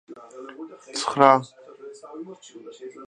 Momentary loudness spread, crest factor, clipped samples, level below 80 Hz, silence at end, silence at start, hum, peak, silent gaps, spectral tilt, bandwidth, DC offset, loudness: 26 LU; 26 dB; under 0.1%; -72 dBFS; 0 s; 0.1 s; none; 0 dBFS; none; -4.5 dB/octave; 11 kHz; under 0.1%; -20 LUFS